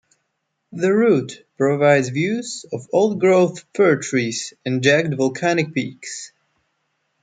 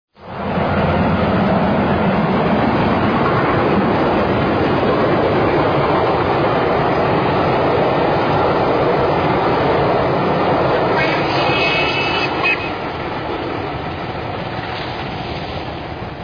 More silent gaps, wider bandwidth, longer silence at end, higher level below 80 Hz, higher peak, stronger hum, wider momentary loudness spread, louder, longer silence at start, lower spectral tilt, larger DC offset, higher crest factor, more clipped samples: neither; first, 9.4 kHz vs 5.2 kHz; first, 0.95 s vs 0 s; second, -66 dBFS vs -36 dBFS; about the same, -2 dBFS vs -4 dBFS; neither; first, 14 LU vs 9 LU; second, -19 LUFS vs -16 LUFS; first, 0.7 s vs 0.2 s; second, -5.5 dB/octave vs -7.5 dB/octave; second, under 0.1% vs 0.1%; first, 18 dB vs 12 dB; neither